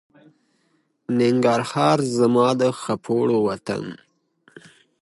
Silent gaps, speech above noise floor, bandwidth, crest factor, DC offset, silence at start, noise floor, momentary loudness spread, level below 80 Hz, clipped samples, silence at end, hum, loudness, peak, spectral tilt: none; 47 dB; 11.5 kHz; 18 dB; under 0.1%; 1.1 s; -67 dBFS; 11 LU; -64 dBFS; under 0.1%; 1.1 s; none; -20 LUFS; -4 dBFS; -6 dB/octave